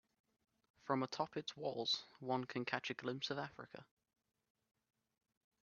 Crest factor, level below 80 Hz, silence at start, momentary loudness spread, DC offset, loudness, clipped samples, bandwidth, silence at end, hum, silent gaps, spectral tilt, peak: 26 dB; -86 dBFS; 0.85 s; 15 LU; under 0.1%; -42 LUFS; under 0.1%; 7 kHz; 1.8 s; none; none; -2.5 dB/octave; -20 dBFS